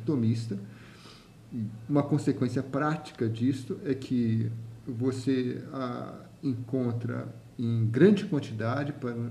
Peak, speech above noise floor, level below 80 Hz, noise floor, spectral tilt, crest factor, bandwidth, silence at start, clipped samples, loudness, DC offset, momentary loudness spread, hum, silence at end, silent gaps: -8 dBFS; 22 dB; -66 dBFS; -51 dBFS; -8 dB/octave; 22 dB; 11.5 kHz; 0 s; under 0.1%; -30 LUFS; under 0.1%; 12 LU; none; 0 s; none